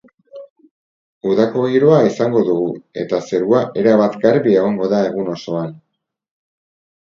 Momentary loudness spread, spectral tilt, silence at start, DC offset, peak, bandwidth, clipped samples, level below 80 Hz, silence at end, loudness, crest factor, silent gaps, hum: 11 LU; -7.5 dB/octave; 0.35 s; under 0.1%; 0 dBFS; 7.4 kHz; under 0.1%; -60 dBFS; 1.25 s; -16 LUFS; 16 dB; 0.50-0.56 s, 0.71-1.21 s; none